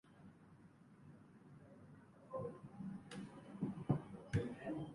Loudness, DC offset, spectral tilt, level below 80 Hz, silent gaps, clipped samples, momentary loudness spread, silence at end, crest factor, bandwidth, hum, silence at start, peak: -46 LUFS; under 0.1%; -8 dB/octave; -68 dBFS; none; under 0.1%; 21 LU; 0 s; 24 dB; 11 kHz; none; 0.05 s; -24 dBFS